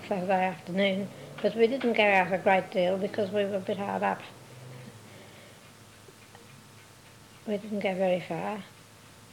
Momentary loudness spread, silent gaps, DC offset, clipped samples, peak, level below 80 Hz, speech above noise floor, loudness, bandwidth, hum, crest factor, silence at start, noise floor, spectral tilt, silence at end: 23 LU; none; under 0.1%; under 0.1%; -10 dBFS; -72 dBFS; 25 dB; -28 LUFS; 18 kHz; none; 20 dB; 0 s; -53 dBFS; -5.5 dB/octave; 0.05 s